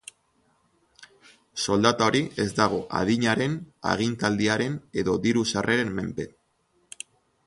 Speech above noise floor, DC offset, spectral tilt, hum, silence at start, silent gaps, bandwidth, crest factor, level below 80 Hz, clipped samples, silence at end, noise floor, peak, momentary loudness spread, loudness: 44 dB; under 0.1%; -4.5 dB/octave; none; 1 s; none; 11.5 kHz; 22 dB; -54 dBFS; under 0.1%; 1.2 s; -68 dBFS; -6 dBFS; 17 LU; -25 LUFS